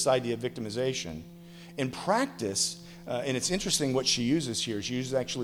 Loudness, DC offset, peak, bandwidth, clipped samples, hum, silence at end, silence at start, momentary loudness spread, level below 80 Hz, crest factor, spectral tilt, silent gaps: -29 LUFS; under 0.1%; -12 dBFS; 19.5 kHz; under 0.1%; none; 0 s; 0 s; 14 LU; -56 dBFS; 18 dB; -3.5 dB/octave; none